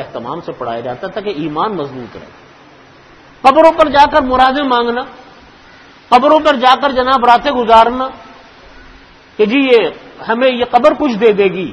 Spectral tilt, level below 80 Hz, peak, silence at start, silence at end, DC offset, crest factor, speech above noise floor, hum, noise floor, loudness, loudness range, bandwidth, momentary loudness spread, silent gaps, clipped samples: -5.5 dB/octave; -42 dBFS; 0 dBFS; 0 s; 0 s; under 0.1%; 12 dB; 30 dB; none; -41 dBFS; -11 LUFS; 4 LU; 12 kHz; 15 LU; none; 0.6%